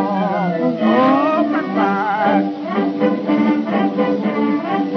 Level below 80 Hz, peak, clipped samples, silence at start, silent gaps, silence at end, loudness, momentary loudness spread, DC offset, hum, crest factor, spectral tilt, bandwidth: -66 dBFS; -2 dBFS; under 0.1%; 0 s; none; 0 s; -17 LUFS; 4 LU; under 0.1%; none; 16 dB; -8.5 dB/octave; 6.2 kHz